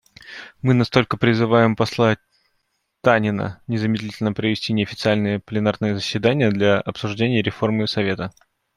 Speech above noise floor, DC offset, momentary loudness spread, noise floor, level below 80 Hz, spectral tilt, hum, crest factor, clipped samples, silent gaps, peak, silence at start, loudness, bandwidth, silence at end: 52 dB; under 0.1%; 9 LU; -71 dBFS; -56 dBFS; -6.5 dB/octave; none; 18 dB; under 0.1%; none; -2 dBFS; 0.25 s; -20 LUFS; 12 kHz; 0.45 s